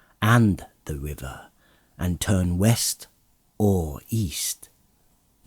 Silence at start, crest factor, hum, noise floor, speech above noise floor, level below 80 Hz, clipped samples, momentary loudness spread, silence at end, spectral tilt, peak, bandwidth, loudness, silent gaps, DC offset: 0.2 s; 20 dB; none; -63 dBFS; 39 dB; -44 dBFS; under 0.1%; 16 LU; 0.9 s; -5 dB/octave; -6 dBFS; over 20 kHz; -24 LUFS; none; under 0.1%